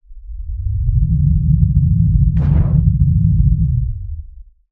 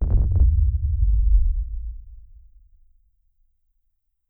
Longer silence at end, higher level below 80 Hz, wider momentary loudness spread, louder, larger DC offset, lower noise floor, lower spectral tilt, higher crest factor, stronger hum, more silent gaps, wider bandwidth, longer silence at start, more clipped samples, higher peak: second, 0.3 s vs 2.15 s; about the same, -18 dBFS vs -22 dBFS; about the same, 15 LU vs 16 LU; first, -15 LUFS vs -22 LUFS; neither; second, -37 dBFS vs -72 dBFS; second, -13 dB/octave vs -14.5 dB/octave; about the same, 14 dB vs 14 dB; neither; neither; first, 2.4 kHz vs 1.1 kHz; about the same, 0.1 s vs 0 s; neither; first, 0 dBFS vs -8 dBFS